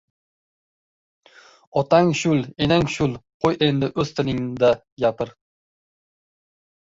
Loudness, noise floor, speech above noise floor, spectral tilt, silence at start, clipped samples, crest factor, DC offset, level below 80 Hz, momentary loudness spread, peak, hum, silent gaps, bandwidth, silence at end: -21 LUFS; under -90 dBFS; over 70 dB; -6 dB/octave; 1.75 s; under 0.1%; 20 dB; under 0.1%; -50 dBFS; 8 LU; -2 dBFS; none; 3.34-3.40 s, 4.92-4.97 s; 7.8 kHz; 1.55 s